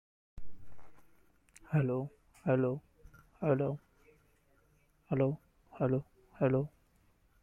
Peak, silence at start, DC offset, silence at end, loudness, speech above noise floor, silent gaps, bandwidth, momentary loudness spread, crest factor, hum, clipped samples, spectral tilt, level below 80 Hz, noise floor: -16 dBFS; 0.35 s; under 0.1%; 0.75 s; -35 LUFS; 38 dB; none; 9.8 kHz; 12 LU; 20 dB; none; under 0.1%; -10 dB/octave; -62 dBFS; -70 dBFS